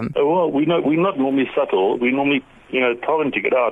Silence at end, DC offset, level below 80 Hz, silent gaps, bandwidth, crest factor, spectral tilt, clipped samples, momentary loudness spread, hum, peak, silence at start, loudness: 0 s; under 0.1%; -58 dBFS; none; 4.6 kHz; 14 dB; -8 dB/octave; under 0.1%; 3 LU; none; -6 dBFS; 0 s; -19 LUFS